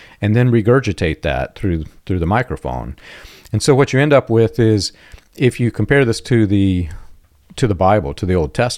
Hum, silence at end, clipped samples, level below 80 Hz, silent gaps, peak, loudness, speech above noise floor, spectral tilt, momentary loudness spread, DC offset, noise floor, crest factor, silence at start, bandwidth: none; 0 s; under 0.1%; -36 dBFS; none; 0 dBFS; -16 LUFS; 26 dB; -6.5 dB/octave; 11 LU; under 0.1%; -42 dBFS; 16 dB; 0.2 s; 14 kHz